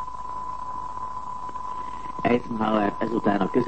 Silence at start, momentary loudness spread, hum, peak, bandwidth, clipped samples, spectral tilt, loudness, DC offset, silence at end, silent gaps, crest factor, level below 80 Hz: 0 s; 10 LU; none; -8 dBFS; 8.6 kHz; under 0.1%; -7.5 dB/octave; -27 LUFS; 1%; 0 s; none; 18 dB; -52 dBFS